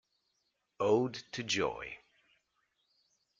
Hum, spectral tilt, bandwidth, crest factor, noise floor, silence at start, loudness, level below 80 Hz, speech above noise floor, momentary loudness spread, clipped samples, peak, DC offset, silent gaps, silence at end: none; -4 dB/octave; 7.6 kHz; 22 dB; -81 dBFS; 0.8 s; -34 LUFS; -70 dBFS; 48 dB; 15 LU; under 0.1%; -16 dBFS; under 0.1%; none; 1.45 s